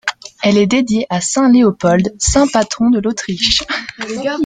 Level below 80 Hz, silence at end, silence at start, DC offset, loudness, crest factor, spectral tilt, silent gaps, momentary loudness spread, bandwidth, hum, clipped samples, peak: -34 dBFS; 0 s; 0.05 s; under 0.1%; -14 LUFS; 14 dB; -4 dB/octave; none; 10 LU; 9.6 kHz; none; under 0.1%; 0 dBFS